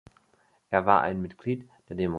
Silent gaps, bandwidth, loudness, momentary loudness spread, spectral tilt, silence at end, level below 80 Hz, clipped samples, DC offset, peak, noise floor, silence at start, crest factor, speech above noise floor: none; 6.6 kHz; -27 LUFS; 12 LU; -8.5 dB/octave; 0 s; -54 dBFS; under 0.1%; under 0.1%; -4 dBFS; -66 dBFS; 0.7 s; 24 dB; 40 dB